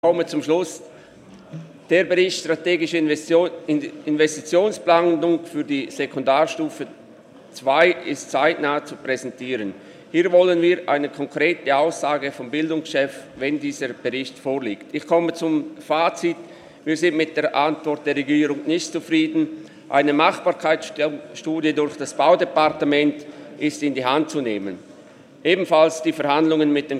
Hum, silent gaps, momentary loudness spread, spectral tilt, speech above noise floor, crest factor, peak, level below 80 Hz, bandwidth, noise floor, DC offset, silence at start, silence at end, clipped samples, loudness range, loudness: none; none; 10 LU; -4.5 dB/octave; 25 dB; 18 dB; -2 dBFS; -72 dBFS; 13 kHz; -46 dBFS; under 0.1%; 0.05 s; 0 s; under 0.1%; 3 LU; -21 LUFS